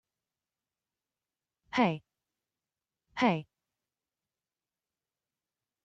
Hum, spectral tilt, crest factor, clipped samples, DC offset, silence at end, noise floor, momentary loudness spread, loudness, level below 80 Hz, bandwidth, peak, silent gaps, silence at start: none; -6.5 dB/octave; 24 dB; under 0.1%; under 0.1%; 2.4 s; under -90 dBFS; 12 LU; -31 LUFS; -78 dBFS; 7.8 kHz; -14 dBFS; none; 1.75 s